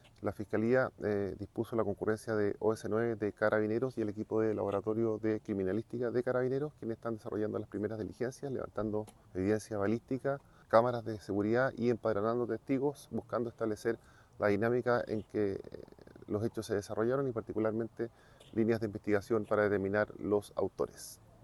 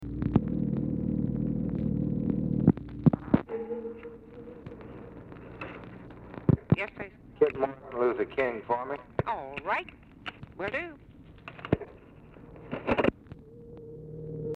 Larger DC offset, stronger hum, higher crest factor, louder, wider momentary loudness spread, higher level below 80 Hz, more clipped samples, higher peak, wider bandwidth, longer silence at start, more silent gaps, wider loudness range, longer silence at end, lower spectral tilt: neither; neither; about the same, 22 dB vs 24 dB; second, -34 LUFS vs -30 LUFS; second, 9 LU vs 20 LU; second, -66 dBFS vs -48 dBFS; neither; second, -12 dBFS vs -6 dBFS; first, 12.5 kHz vs 5.2 kHz; first, 0.2 s vs 0 s; neither; second, 4 LU vs 7 LU; first, 0.3 s vs 0 s; second, -7 dB/octave vs -10 dB/octave